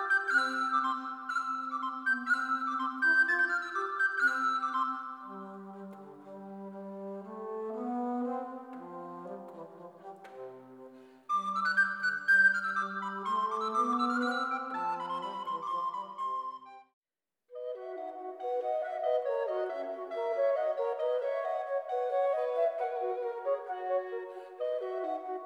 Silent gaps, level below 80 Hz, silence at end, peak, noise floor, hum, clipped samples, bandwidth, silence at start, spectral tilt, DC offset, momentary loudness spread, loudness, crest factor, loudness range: 16.93-17.02 s; under -90 dBFS; 0 s; -16 dBFS; -84 dBFS; none; under 0.1%; 12.5 kHz; 0 s; -4 dB/octave; under 0.1%; 18 LU; -32 LUFS; 18 dB; 11 LU